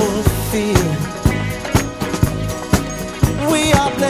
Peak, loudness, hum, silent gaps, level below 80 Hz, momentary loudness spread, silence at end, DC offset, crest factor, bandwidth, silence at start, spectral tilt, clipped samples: 0 dBFS; -18 LUFS; none; none; -26 dBFS; 6 LU; 0 s; 0.1%; 16 dB; 16 kHz; 0 s; -5 dB/octave; under 0.1%